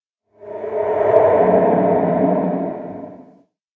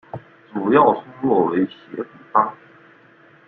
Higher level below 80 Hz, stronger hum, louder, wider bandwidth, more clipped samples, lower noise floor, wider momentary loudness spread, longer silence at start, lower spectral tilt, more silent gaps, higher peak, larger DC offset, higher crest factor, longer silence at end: first, -54 dBFS vs -62 dBFS; neither; first, -16 LUFS vs -19 LUFS; second, 3.9 kHz vs 4.3 kHz; neither; about the same, -51 dBFS vs -51 dBFS; about the same, 19 LU vs 17 LU; first, 0.4 s vs 0.15 s; about the same, -10.5 dB/octave vs -10 dB/octave; neither; about the same, 0 dBFS vs -2 dBFS; neither; about the same, 18 dB vs 20 dB; second, 0.55 s vs 0.95 s